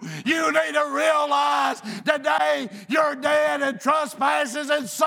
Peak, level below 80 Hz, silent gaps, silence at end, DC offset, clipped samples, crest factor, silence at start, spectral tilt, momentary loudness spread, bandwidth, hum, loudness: -4 dBFS; -82 dBFS; none; 0 s; under 0.1%; under 0.1%; 18 dB; 0 s; -3 dB/octave; 4 LU; 18.5 kHz; none; -22 LUFS